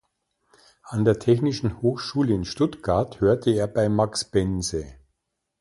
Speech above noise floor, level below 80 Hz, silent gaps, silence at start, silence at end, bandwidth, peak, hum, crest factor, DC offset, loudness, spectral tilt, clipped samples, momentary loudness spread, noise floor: 55 dB; -46 dBFS; none; 0.85 s; 0.65 s; 11.5 kHz; -6 dBFS; none; 18 dB; under 0.1%; -24 LUFS; -6 dB/octave; under 0.1%; 6 LU; -78 dBFS